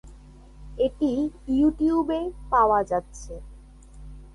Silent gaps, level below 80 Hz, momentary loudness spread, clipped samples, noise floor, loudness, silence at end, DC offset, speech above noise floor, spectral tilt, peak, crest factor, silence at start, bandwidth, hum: none; -44 dBFS; 20 LU; under 0.1%; -47 dBFS; -24 LUFS; 0.05 s; under 0.1%; 23 dB; -6.5 dB/octave; -8 dBFS; 16 dB; 0.05 s; 11 kHz; none